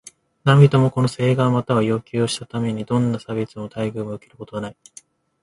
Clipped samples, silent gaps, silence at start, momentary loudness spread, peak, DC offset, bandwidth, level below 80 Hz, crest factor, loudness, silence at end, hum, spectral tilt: under 0.1%; none; 0.45 s; 17 LU; 0 dBFS; under 0.1%; 11.5 kHz; -56 dBFS; 20 dB; -20 LUFS; 0.7 s; none; -7 dB/octave